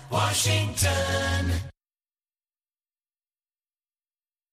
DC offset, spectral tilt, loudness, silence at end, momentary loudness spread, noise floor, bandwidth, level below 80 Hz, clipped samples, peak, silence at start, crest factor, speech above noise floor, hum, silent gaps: under 0.1%; -3.5 dB/octave; -25 LUFS; 2.8 s; 8 LU; under -90 dBFS; 15.5 kHz; -44 dBFS; under 0.1%; -12 dBFS; 0 s; 18 dB; over 65 dB; none; none